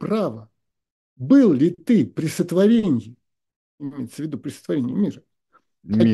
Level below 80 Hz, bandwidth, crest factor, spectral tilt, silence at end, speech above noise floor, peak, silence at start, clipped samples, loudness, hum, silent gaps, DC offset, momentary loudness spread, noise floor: -62 dBFS; 12.5 kHz; 16 dB; -7.5 dB/octave; 0 s; 43 dB; -4 dBFS; 0 s; under 0.1%; -20 LUFS; none; 0.91-1.16 s, 3.56-3.78 s; under 0.1%; 17 LU; -63 dBFS